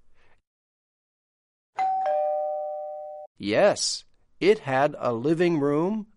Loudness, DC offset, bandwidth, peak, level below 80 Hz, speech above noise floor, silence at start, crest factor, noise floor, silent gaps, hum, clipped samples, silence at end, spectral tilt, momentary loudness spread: -25 LUFS; under 0.1%; 11.5 kHz; -8 dBFS; -66 dBFS; over 67 dB; 1.75 s; 18 dB; under -90 dBFS; 3.27-3.35 s; none; under 0.1%; 0.1 s; -4.5 dB/octave; 13 LU